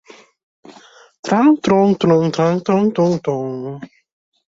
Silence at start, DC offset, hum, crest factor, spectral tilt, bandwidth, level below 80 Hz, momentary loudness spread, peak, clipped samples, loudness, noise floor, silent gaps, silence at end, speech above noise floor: 0.7 s; under 0.1%; none; 16 dB; -7 dB/octave; 7.8 kHz; -58 dBFS; 15 LU; -2 dBFS; under 0.1%; -16 LUFS; -45 dBFS; 1.19-1.23 s; 0.65 s; 30 dB